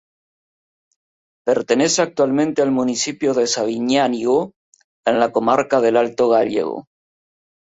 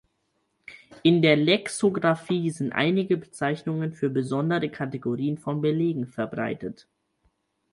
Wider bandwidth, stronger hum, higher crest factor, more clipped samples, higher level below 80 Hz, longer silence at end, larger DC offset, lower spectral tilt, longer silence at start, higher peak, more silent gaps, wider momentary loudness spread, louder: second, 8 kHz vs 11.5 kHz; neither; about the same, 16 dB vs 20 dB; neither; about the same, -62 dBFS vs -66 dBFS; about the same, 0.95 s vs 1 s; neither; second, -3.5 dB/octave vs -6 dB/octave; first, 1.45 s vs 0.7 s; first, -2 dBFS vs -6 dBFS; first, 4.56-4.72 s, 4.84-5.04 s vs none; second, 6 LU vs 10 LU; first, -18 LUFS vs -25 LUFS